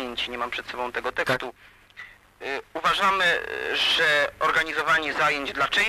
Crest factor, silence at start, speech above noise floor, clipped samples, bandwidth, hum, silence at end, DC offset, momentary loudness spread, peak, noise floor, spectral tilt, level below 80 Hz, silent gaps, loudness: 16 dB; 0 s; 22 dB; under 0.1%; 15.5 kHz; 50 Hz at -60 dBFS; 0 s; under 0.1%; 13 LU; -10 dBFS; -46 dBFS; -2 dB/octave; -56 dBFS; none; -23 LUFS